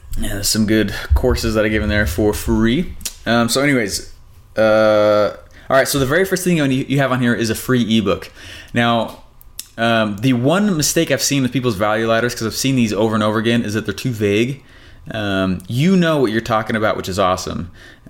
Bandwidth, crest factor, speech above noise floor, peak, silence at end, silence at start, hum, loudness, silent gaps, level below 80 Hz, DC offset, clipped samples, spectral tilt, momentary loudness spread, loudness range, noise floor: 17 kHz; 12 dB; 21 dB; -4 dBFS; 0.2 s; 0.05 s; none; -17 LUFS; none; -30 dBFS; under 0.1%; under 0.1%; -5 dB/octave; 9 LU; 3 LU; -37 dBFS